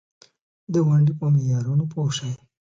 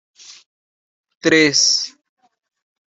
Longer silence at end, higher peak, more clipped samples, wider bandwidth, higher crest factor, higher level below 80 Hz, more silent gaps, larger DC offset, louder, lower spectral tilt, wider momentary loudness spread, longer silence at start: second, 0.25 s vs 1 s; second, -10 dBFS vs -2 dBFS; neither; about the same, 7.6 kHz vs 8.2 kHz; second, 12 dB vs 20 dB; about the same, -62 dBFS vs -66 dBFS; second, none vs 0.46-1.04 s, 1.15-1.20 s; neither; second, -22 LUFS vs -14 LUFS; first, -7 dB/octave vs -1.5 dB/octave; second, 8 LU vs 11 LU; first, 0.7 s vs 0.3 s